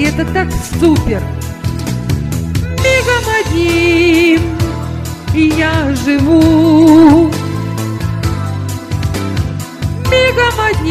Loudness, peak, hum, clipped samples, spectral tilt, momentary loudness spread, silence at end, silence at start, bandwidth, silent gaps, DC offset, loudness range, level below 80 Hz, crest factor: -12 LUFS; 0 dBFS; none; 0.1%; -6 dB/octave; 12 LU; 0 s; 0 s; 15 kHz; none; under 0.1%; 5 LU; -26 dBFS; 12 dB